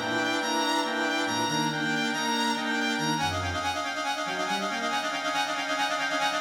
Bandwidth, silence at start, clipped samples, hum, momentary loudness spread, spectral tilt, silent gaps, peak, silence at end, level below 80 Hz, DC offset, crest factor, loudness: 20 kHz; 0 s; under 0.1%; none; 3 LU; -3 dB/octave; none; -14 dBFS; 0 s; -60 dBFS; under 0.1%; 12 dB; -27 LUFS